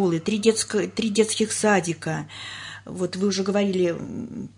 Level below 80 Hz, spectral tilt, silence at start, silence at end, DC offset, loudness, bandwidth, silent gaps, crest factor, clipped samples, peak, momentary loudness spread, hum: -62 dBFS; -4.5 dB/octave; 0 s; 0.1 s; under 0.1%; -23 LUFS; 11 kHz; none; 18 dB; under 0.1%; -6 dBFS; 13 LU; none